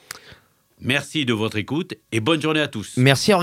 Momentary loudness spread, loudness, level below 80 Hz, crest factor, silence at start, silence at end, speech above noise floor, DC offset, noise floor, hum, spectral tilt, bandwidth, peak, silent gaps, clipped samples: 11 LU; -21 LUFS; -60 dBFS; 22 dB; 0.15 s; 0 s; 32 dB; under 0.1%; -52 dBFS; none; -5 dB/octave; 16 kHz; 0 dBFS; none; under 0.1%